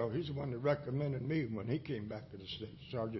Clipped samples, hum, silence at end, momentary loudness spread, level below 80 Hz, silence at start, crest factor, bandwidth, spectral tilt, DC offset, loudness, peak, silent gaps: under 0.1%; none; 0 s; 10 LU; -62 dBFS; 0 s; 18 dB; 6 kHz; -6.5 dB/octave; under 0.1%; -39 LUFS; -22 dBFS; none